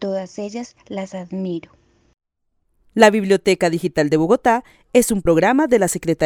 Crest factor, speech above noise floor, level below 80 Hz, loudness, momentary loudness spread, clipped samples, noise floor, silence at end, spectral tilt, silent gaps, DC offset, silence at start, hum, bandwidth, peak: 18 dB; 51 dB; -46 dBFS; -17 LUFS; 15 LU; under 0.1%; -69 dBFS; 0 s; -5 dB/octave; none; under 0.1%; 0 s; none; 18.5 kHz; 0 dBFS